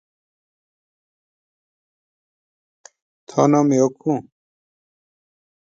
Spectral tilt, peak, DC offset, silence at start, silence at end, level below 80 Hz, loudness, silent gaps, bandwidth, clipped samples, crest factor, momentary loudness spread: -7 dB/octave; -4 dBFS; under 0.1%; 3.3 s; 1.45 s; -70 dBFS; -19 LUFS; none; 7.8 kHz; under 0.1%; 22 dB; 11 LU